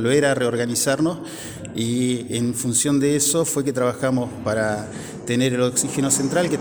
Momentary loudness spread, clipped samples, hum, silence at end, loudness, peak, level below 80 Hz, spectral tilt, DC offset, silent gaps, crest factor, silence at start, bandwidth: 10 LU; under 0.1%; none; 0 s; -21 LUFS; -4 dBFS; -54 dBFS; -4 dB/octave; under 0.1%; none; 18 dB; 0 s; over 20 kHz